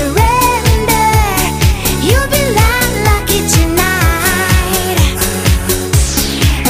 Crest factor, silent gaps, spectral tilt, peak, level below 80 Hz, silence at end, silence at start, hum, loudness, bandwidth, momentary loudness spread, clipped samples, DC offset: 10 dB; none; -4 dB/octave; 0 dBFS; -16 dBFS; 0 s; 0 s; none; -11 LUFS; 16 kHz; 3 LU; under 0.1%; under 0.1%